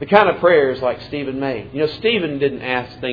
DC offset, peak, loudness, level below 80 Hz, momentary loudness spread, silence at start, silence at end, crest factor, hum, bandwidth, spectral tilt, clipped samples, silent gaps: under 0.1%; 0 dBFS; -18 LUFS; -50 dBFS; 10 LU; 0 s; 0 s; 18 dB; none; 5.4 kHz; -7.5 dB/octave; under 0.1%; none